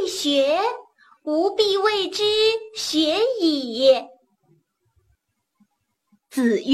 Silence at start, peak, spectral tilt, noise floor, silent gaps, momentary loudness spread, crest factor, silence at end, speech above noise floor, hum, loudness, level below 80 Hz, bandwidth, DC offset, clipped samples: 0 s; -4 dBFS; -2.5 dB/octave; -70 dBFS; none; 8 LU; 18 dB; 0 s; 50 dB; none; -20 LUFS; -62 dBFS; 14.5 kHz; under 0.1%; under 0.1%